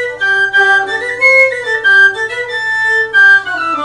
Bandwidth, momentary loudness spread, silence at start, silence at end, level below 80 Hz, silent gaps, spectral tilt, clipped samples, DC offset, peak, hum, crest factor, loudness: 12 kHz; 10 LU; 0 s; 0 s; -54 dBFS; none; -1.5 dB/octave; under 0.1%; under 0.1%; 0 dBFS; none; 10 dB; -9 LUFS